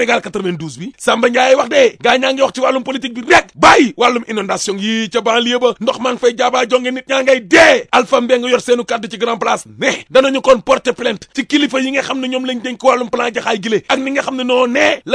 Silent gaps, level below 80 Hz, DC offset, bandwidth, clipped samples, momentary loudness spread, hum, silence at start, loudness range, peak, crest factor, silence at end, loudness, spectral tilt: none; -50 dBFS; under 0.1%; 11 kHz; 0.2%; 10 LU; none; 0 s; 4 LU; 0 dBFS; 14 dB; 0 s; -13 LUFS; -3 dB/octave